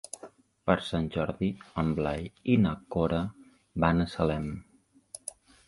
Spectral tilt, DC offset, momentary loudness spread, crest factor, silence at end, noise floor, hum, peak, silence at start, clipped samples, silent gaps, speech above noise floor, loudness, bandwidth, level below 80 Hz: -6.5 dB/octave; under 0.1%; 16 LU; 22 dB; 0.4 s; -52 dBFS; none; -8 dBFS; 0.15 s; under 0.1%; none; 24 dB; -30 LUFS; 11.5 kHz; -46 dBFS